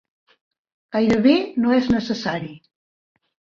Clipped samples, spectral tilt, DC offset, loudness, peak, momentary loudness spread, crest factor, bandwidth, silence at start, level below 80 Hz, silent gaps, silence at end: under 0.1%; -6.5 dB/octave; under 0.1%; -20 LUFS; -4 dBFS; 11 LU; 18 dB; 7.2 kHz; 0.95 s; -52 dBFS; none; 1 s